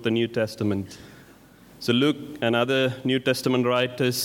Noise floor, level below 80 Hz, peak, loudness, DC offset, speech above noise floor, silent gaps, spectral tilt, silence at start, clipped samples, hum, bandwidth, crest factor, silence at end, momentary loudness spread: -51 dBFS; -64 dBFS; -8 dBFS; -24 LUFS; under 0.1%; 27 dB; none; -5 dB/octave; 0 s; under 0.1%; none; 18 kHz; 18 dB; 0 s; 8 LU